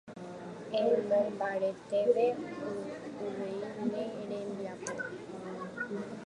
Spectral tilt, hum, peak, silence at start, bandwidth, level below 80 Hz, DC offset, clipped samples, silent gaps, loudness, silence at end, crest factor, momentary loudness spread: -5.5 dB/octave; none; -16 dBFS; 0.05 s; 11 kHz; -74 dBFS; under 0.1%; under 0.1%; none; -34 LUFS; 0 s; 18 dB; 13 LU